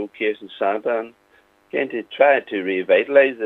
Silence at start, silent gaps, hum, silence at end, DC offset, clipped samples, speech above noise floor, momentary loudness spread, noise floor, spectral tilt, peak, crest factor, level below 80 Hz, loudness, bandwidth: 0 s; none; none; 0 s; under 0.1%; under 0.1%; 37 dB; 11 LU; -57 dBFS; -6.5 dB/octave; 0 dBFS; 20 dB; -76 dBFS; -20 LUFS; 4 kHz